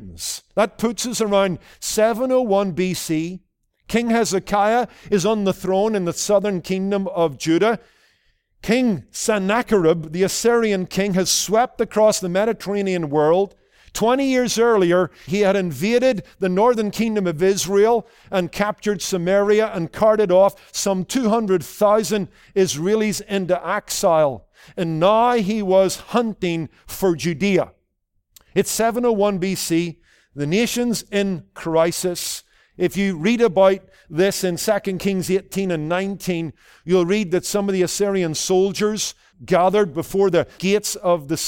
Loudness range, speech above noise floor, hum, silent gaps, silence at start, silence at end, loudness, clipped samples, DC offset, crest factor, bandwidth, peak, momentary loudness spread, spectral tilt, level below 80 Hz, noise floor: 3 LU; 51 dB; none; none; 0 s; 0 s; -20 LUFS; under 0.1%; under 0.1%; 16 dB; 17 kHz; -4 dBFS; 8 LU; -4.5 dB/octave; -52 dBFS; -70 dBFS